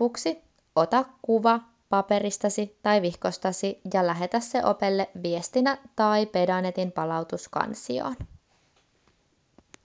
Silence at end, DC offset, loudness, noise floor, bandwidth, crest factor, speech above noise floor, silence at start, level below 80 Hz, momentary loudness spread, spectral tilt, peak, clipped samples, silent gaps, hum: 1.6 s; under 0.1%; -26 LUFS; -67 dBFS; 8 kHz; 20 dB; 42 dB; 0 s; -58 dBFS; 8 LU; -5 dB/octave; -6 dBFS; under 0.1%; none; none